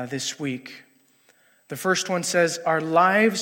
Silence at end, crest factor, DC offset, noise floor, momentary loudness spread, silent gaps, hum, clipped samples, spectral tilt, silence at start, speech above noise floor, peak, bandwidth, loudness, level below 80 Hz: 0 s; 20 dB; under 0.1%; -60 dBFS; 16 LU; none; none; under 0.1%; -3.5 dB/octave; 0 s; 37 dB; -4 dBFS; 16.5 kHz; -22 LUFS; -74 dBFS